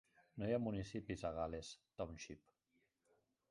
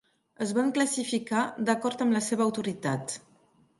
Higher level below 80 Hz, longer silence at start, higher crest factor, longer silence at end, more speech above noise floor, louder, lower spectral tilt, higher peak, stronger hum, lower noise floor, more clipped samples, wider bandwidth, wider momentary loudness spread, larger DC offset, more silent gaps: first, -64 dBFS vs -74 dBFS; second, 0.2 s vs 0.4 s; about the same, 20 dB vs 20 dB; first, 1.15 s vs 0.6 s; about the same, 38 dB vs 36 dB; second, -46 LUFS vs -28 LUFS; first, -6 dB/octave vs -4.5 dB/octave; second, -28 dBFS vs -10 dBFS; neither; first, -83 dBFS vs -63 dBFS; neither; about the same, 11 kHz vs 11.5 kHz; first, 14 LU vs 7 LU; neither; neither